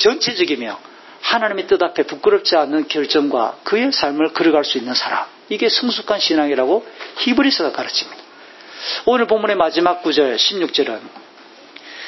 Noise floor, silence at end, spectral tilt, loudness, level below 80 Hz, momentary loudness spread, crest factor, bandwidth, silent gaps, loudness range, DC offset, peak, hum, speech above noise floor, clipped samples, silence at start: -43 dBFS; 0 s; -3 dB/octave; -17 LUFS; -60 dBFS; 9 LU; 18 dB; 6.2 kHz; none; 2 LU; under 0.1%; 0 dBFS; none; 26 dB; under 0.1%; 0 s